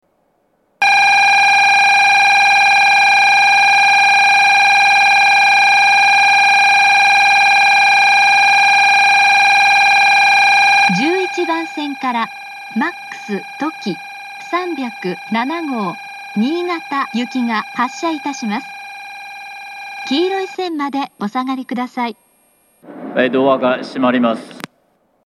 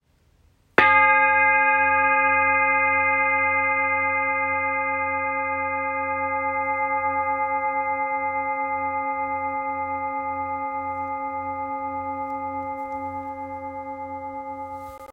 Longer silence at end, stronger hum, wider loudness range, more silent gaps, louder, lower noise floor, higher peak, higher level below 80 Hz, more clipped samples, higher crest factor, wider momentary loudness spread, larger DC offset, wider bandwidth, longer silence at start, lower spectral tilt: first, 0.65 s vs 0 s; neither; about the same, 13 LU vs 12 LU; neither; first, -11 LUFS vs -22 LUFS; about the same, -61 dBFS vs -60 dBFS; about the same, 0 dBFS vs -2 dBFS; second, -78 dBFS vs -62 dBFS; neither; second, 14 dB vs 22 dB; about the same, 16 LU vs 16 LU; neither; first, 13.5 kHz vs 5 kHz; about the same, 0.8 s vs 0.8 s; second, -2.5 dB/octave vs -6 dB/octave